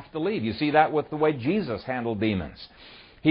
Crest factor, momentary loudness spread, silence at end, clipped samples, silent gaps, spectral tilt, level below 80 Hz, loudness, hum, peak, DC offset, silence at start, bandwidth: 20 dB; 12 LU; 0 s; under 0.1%; none; -11 dB/octave; -54 dBFS; -26 LUFS; none; -4 dBFS; under 0.1%; 0 s; 5.6 kHz